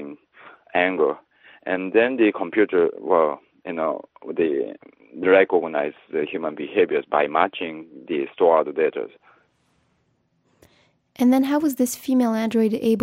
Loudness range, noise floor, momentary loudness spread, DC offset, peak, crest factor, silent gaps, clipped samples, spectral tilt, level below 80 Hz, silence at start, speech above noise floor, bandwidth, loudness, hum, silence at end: 4 LU; -68 dBFS; 14 LU; under 0.1%; -2 dBFS; 20 dB; none; under 0.1%; -5 dB/octave; -70 dBFS; 0 s; 47 dB; 16 kHz; -22 LUFS; none; 0 s